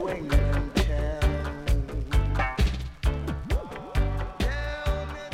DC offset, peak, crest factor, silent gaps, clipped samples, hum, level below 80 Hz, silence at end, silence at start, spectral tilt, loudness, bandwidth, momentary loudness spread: under 0.1%; -10 dBFS; 16 dB; none; under 0.1%; none; -28 dBFS; 0 s; 0 s; -6 dB/octave; -28 LUFS; 14 kHz; 5 LU